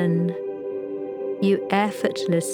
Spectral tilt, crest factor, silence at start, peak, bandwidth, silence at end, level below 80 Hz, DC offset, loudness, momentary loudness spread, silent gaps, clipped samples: -6 dB/octave; 18 dB; 0 s; -4 dBFS; 17 kHz; 0 s; -76 dBFS; under 0.1%; -24 LUFS; 9 LU; none; under 0.1%